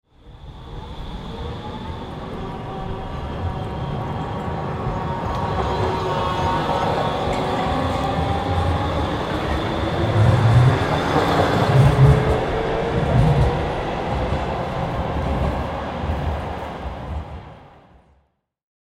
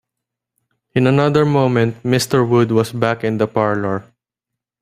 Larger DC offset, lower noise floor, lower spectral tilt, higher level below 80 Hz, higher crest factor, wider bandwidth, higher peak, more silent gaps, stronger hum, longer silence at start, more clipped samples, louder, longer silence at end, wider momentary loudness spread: neither; second, -66 dBFS vs -83 dBFS; about the same, -7 dB/octave vs -6.5 dB/octave; first, -30 dBFS vs -54 dBFS; about the same, 18 dB vs 16 dB; second, 12.5 kHz vs 15 kHz; about the same, -2 dBFS vs -2 dBFS; neither; neither; second, 0.25 s vs 0.95 s; neither; second, -21 LUFS vs -16 LUFS; first, 1.25 s vs 0.8 s; first, 16 LU vs 6 LU